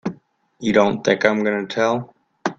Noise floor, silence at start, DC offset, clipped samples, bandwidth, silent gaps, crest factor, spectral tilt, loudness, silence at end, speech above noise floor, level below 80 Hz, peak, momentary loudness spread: -44 dBFS; 0.05 s; under 0.1%; under 0.1%; 7.8 kHz; none; 20 dB; -5.5 dB/octave; -19 LUFS; 0.05 s; 26 dB; -58 dBFS; 0 dBFS; 10 LU